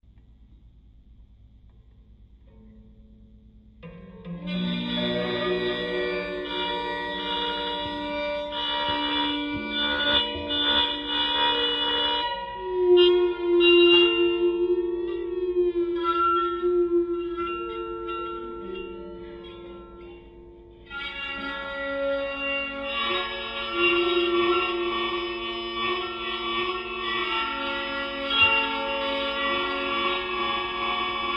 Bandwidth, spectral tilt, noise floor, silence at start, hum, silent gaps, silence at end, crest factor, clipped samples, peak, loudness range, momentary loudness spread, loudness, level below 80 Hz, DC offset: 5.6 kHz; -6 dB/octave; -53 dBFS; 0.4 s; none; none; 0 s; 18 dB; under 0.1%; -8 dBFS; 13 LU; 13 LU; -24 LUFS; -52 dBFS; under 0.1%